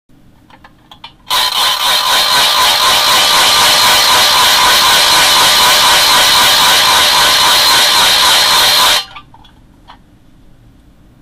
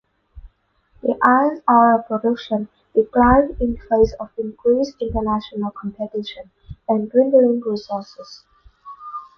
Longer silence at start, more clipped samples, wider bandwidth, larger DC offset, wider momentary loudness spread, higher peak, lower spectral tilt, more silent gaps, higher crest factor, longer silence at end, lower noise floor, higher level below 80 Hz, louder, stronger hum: first, 1.05 s vs 0.35 s; neither; first, 16 kHz vs 6.4 kHz; neither; second, 4 LU vs 17 LU; about the same, -2 dBFS vs 0 dBFS; second, 1 dB/octave vs -7.5 dB/octave; neither; second, 8 dB vs 18 dB; first, 1.3 s vs 0.15 s; second, -43 dBFS vs -59 dBFS; about the same, -40 dBFS vs -38 dBFS; first, -6 LUFS vs -19 LUFS; neither